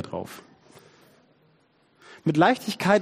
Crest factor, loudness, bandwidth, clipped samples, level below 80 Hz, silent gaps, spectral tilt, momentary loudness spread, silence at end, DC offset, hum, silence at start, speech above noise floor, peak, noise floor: 22 dB; -24 LUFS; 15 kHz; under 0.1%; -68 dBFS; none; -6 dB/octave; 19 LU; 0 s; under 0.1%; none; 0 s; 40 dB; -4 dBFS; -63 dBFS